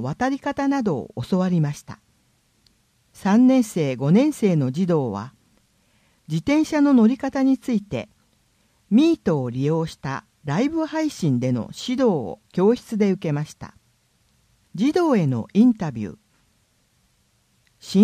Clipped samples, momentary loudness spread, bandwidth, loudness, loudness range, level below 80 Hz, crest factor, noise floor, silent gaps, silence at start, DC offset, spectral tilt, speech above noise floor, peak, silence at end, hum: under 0.1%; 14 LU; 14.5 kHz; -21 LUFS; 3 LU; -58 dBFS; 18 dB; -64 dBFS; none; 0 s; under 0.1%; -7 dB/octave; 44 dB; -4 dBFS; 0 s; none